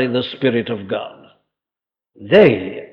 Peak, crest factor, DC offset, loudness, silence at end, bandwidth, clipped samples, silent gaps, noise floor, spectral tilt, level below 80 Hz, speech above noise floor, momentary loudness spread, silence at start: -2 dBFS; 18 dB; under 0.1%; -16 LUFS; 0.05 s; 5.6 kHz; under 0.1%; none; -89 dBFS; -8 dB/octave; -56 dBFS; 73 dB; 14 LU; 0 s